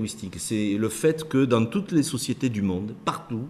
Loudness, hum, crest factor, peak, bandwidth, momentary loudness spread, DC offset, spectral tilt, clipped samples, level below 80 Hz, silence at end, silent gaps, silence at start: -25 LUFS; none; 18 dB; -8 dBFS; 14.5 kHz; 8 LU; under 0.1%; -5.5 dB/octave; under 0.1%; -58 dBFS; 0 s; none; 0 s